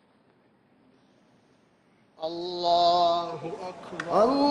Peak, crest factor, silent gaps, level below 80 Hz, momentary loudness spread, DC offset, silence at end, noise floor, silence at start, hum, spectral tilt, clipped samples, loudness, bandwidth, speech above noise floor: -10 dBFS; 18 dB; none; -66 dBFS; 16 LU; under 0.1%; 0 s; -63 dBFS; 2.2 s; none; -5 dB/octave; under 0.1%; -26 LUFS; 9.8 kHz; 38 dB